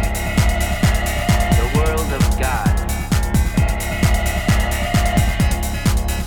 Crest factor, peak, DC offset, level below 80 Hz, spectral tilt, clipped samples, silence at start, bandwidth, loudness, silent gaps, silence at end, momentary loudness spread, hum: 12 dB; -4 dBFS; under 0.1%; -20 dBFS; -5 dB/octave; under 0.1%; 0 s; over 20 kHz; -18 LUFS; none; 0 s; 3 LU; none